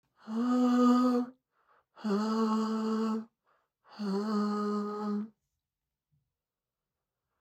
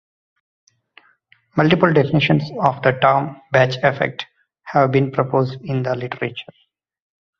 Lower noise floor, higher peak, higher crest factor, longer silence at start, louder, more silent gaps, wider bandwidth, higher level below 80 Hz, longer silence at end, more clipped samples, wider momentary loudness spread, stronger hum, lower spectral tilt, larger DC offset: first, under -90 dBFS vs -57 dBFS; second, -16 dBFS vs 0 dBFS; about the same, 18 dB vs 20 dB; second, 0.25 s vs 1.55 s; second, -31 LUFS vs -18 LUFS; neither; first, 8.8 kHz vs 6.6 kHz; second, under -90 dBFS vs -56 dBFS; first, 2.1 s vs 1 s; neither; first, 14 LU vs 11 LU; neither; about the same, -7 dB/octave vs -7.5 dB/octave; neither